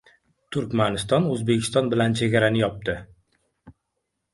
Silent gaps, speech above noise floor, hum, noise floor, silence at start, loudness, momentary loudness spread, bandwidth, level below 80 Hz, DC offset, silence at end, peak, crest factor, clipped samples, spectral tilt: none; 56 dB; none; -79 dBFS; 0.5 s; -23 LUFS; 10 LU; 11.5 kHz; -52 dBFS; under 0.1%; 0.6 s; -6 dBFS; 20 dB; under 0.1%; -5.5 dB/octave